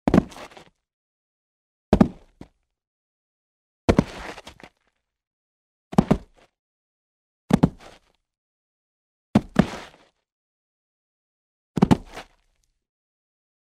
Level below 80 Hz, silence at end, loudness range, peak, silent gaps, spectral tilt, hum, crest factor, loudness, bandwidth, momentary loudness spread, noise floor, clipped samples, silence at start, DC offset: -42 dBFS; 1.45 s; 3 LU; -2 dBFS; 0.93-1.92 s, 2.87-3.88 s, 5.27-5.91 s, 6.59-7.48 s, 8.38-9.34 s, 10.32-11.74 s; -7.5 dB/octave; none; 26 dB; -23 LUFS; 13.5 kHz; 20 LU; -74 dBFS; under 0.1%; 0.05 s; under 0.1%